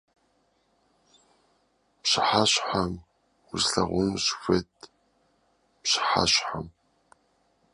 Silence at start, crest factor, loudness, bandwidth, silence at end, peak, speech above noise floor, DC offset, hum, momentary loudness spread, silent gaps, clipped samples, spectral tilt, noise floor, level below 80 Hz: 2.05 s; 22 dB; -25 LUFS; 11.5 kHz; 1.05 s; -6 dBFS; 43 dB; under 0.1%; none; 15 LU; none; under 0.1%; -3 dB/octave; -69 dBFS; -54 dBFS